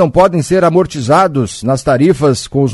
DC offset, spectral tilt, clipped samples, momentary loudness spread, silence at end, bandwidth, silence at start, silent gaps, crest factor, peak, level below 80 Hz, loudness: under 0.1%; -6.5 dB/octave; 0.1%; 5 LU; 0 s; 12 kHz; 0 s; none; 10 dB; 0 dBFS; -38 dBFS; -12 LUFS